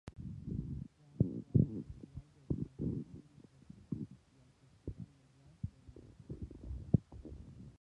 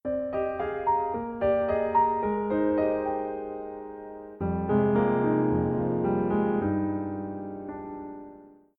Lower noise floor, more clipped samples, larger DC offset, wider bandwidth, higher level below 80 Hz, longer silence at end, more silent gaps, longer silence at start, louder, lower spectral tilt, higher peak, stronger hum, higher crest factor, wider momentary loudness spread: first, -66 dBFS vs -50 dBFS; neither; neither; first, 7.4 kHz vs 4.5 kHz; about the same, -52 dBFS vs -54 dBFS; second, 0.1 s vs 0.3 s; neither; about the same, 0.05 s vs 0.05 s; second, -40 LUFS vs -27 LUFS; about the same, -11 dB/octave vs -11.5 dB/octave; about the same, -14 dBFS vs -12 dBFS; neither; first, 28 dB vs 16 dB; first, 22 LU vs 15 LU